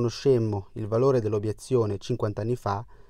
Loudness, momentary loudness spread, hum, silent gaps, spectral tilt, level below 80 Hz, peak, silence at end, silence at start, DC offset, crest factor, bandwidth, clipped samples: -26 LUFS; 7 LU; none; none; -7.5 dB/octave; -54 dBFS; -12 dBFS; 0.1 s; 0 s; under 0.1%; 14 dB; 12.5 kHz; under 0.1%